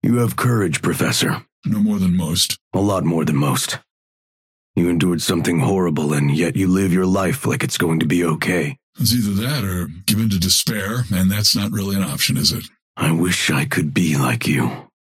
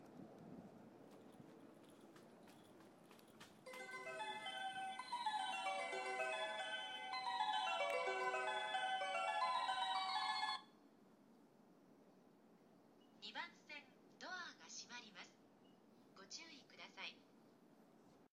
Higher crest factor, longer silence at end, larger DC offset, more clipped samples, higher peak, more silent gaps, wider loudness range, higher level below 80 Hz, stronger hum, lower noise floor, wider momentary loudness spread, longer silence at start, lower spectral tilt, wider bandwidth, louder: about the same, 16 dB vs 20 dB; first, 0.2 s vs 0.05 s; neither; neither; first, -4 dBFS vs -28 dBFS; first, 1.52-1.62 s, 2.61-2.71 s, 3.91-4.74 s, 8.83-8.93 s, 12.82-12.94 s vs none; second, 2 LU vs 16 LU; first, -48 dBFS vs under -90 dBFS; neither; first, under -90 dBFS vs -69 dBFS; second, 6 LU vs 23 LU; about the same, 0.05 s vs 0 s; first, -4.5 dB/octave vs -1.5 dB/octave; about the same, 16.5 kHz vs 15.5 kHz; first, -18 LUFS vs -45 LUFS